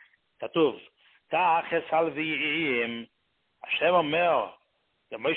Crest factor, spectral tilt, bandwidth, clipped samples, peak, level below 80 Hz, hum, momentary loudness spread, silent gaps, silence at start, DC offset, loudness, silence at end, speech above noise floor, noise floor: 18 dB; -8.5 dB/octave; 4.3 kHz; under 0.1%; -10 dBFS; -70 dBFS; none; 16 LU; none; 0.4 s; under 0.1%; -26 LUFS; 0 s; 47 dB; -73 dBFS